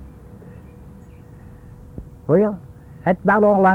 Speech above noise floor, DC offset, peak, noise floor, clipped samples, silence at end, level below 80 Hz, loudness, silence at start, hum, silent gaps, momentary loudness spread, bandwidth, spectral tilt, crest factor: 26 dB; under 0.1%; -4 dBFS; -41 dBFS; under 0.1%; 0 s; -46 dBFS; -18 LUFS; 0 s; none; none; 27 LU; 4.3 kHz; -9.5 dB/octave; 16 dB